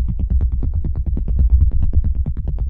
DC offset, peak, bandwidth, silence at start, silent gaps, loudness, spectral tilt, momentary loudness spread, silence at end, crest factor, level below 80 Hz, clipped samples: under 0.1%; -4 dBFS; 1.4 kHz; 0 s; none; -20 LUFS; -13 dB/octave; 7 LU; 0 s; 12 dB; -16 dBFS; under 0.1%